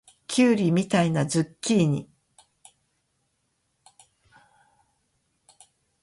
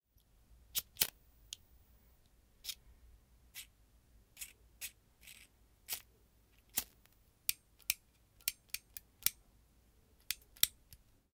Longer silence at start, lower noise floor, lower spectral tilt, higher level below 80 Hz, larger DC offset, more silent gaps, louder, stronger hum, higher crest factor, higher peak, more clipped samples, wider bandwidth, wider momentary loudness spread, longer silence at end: second, 0.3 s vs 0.5 s; first, -74 dBFS vs -70 dBFS; first, -5.5 dB/octave vs 1 dB/octave; about the same, -66 dBFS vs -68 dBFS; neither; neither; first, -23 LUFS vs -40 LUFS; neither; second, 20 dB vs 40 dB; about the same, -8 dBFS vs -6 dBFS; neither; second, 11.5 kHz vs 17 kHz; second, 6 LU vs 20 LU; first, 4 s vs 0.4 s